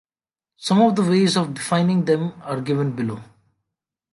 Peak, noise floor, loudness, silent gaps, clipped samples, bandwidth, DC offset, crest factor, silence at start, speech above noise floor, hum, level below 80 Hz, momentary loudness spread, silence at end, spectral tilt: -4 dBFS; under -90 dBFS; -20 LUFS; none; under 0.1%; 11.5 kHz; under 0.1%; 18 dB; 0.6 s; over 71 dB; none; -64 dBFS; 11 LU; 0.9 s; -6 dB/octave